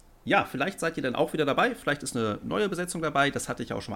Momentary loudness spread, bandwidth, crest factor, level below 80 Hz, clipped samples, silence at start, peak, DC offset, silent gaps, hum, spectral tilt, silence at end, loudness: 5 LU; 17 kHz; 18 dB; -56 dBFS; under 0.1%; 0.25 s; -10 dBFS; under 0.1%; none; none; -4.5 dB/octave; 0 s; -28 LUFS